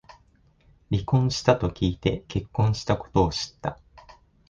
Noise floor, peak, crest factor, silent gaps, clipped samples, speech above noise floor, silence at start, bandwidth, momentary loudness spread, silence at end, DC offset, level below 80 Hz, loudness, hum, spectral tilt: -60 dBFS; -4 dBFS; 22 dB; none; under 0.1%; 36 dB; 0.9 s; 9.2 kHz; 9 LU; 0.4 s; under 0.1%; -42 dBFS; -25 LUFS; none; -6.5 dB/octave